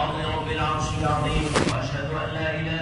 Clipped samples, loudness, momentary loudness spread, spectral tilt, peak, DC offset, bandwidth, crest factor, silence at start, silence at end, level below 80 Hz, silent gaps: under 0.1%; -25 LUFS; 5 LU; -5 dB/octave; -6 dBFS; under 0.1%; 11 kHz; 20 dB; 0 s; 0 s; -36 dBFS; none